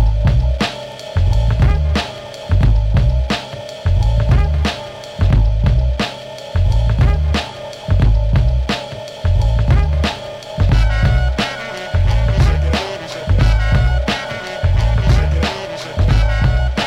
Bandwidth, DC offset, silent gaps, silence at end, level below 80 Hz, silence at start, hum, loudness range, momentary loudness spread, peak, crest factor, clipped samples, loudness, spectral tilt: 9.4 kHz; under 0.1%; none; 0 s; -16 dBFS; 0 s; none; 1 LU; 9 LU; -2 dBFS; 12 dB; under 0.1%; -17 LUFS; -6.5 dB/octave